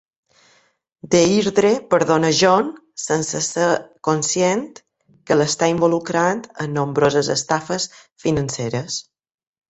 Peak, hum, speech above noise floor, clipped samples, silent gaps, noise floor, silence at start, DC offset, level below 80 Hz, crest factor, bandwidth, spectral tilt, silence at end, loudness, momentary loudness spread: -2 dBFS; none; 39 dB; under 0.1%; 8.12-8.16 s; -57 dBFS; 1.05 s; under 0.1%; -56 dBFS; 18 dB; 8.4 kHz; -4 dB/octave; 0.7 s; -19 LUFS; 10 LU